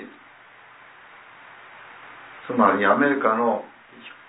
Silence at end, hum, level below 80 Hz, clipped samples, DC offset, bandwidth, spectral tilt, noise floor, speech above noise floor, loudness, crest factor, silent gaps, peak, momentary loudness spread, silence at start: 0.2 s; none; -76 dBFS; under 0.1%; under 0.1%; 4 kHz; -9.5 dB/octave; -49 dBFS; 29 dB; -20 LUFS; 22 dB; none; -2 dBFS; 25 LU; 0 s